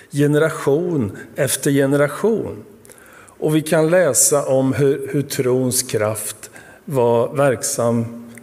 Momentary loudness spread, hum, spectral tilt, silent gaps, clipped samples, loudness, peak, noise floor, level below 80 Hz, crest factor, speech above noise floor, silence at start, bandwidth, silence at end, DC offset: 12 LU; none; -4.5 dB/octave; none; under 0.1%; -18 LUFS; -2 dBFS; -44 dBFS; -60 dBFS; 16 dB; 26 dB; 0.15 s; 16 kHz; 0 s; under 0.1%